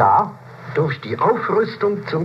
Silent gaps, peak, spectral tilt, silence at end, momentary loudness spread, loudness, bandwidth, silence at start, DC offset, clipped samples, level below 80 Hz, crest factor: none; -2 dBFS; -8 dB/octave; 0 s; 9 LU; -20 LUFS; 7.2 kHz; 0 s; under 0.1%; under 0.1%; -64 dBFS; 16 dB